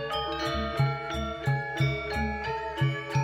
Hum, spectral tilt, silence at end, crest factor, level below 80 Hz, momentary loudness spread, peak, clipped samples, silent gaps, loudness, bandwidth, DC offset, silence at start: none; -6 dB/octave; 0 s; 14 dB; -42 dBFS; 4 LU; -14 dBFS; under 0.1%; none; -30 LUFS; 13 kHz; under 0.1%; 0 s